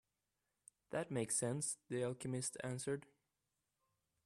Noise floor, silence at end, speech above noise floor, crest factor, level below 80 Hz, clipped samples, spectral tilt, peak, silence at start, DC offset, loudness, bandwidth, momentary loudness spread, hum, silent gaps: -89 dBFS; 1.25 s; 47 dB; 18 dB; -80 dBFS; under 0.1%; -4.5 dB/octave; -28 dBFS; 0.9 s; under 0.1%; -42 LUFS; 13 kHz; 7 LU; none; none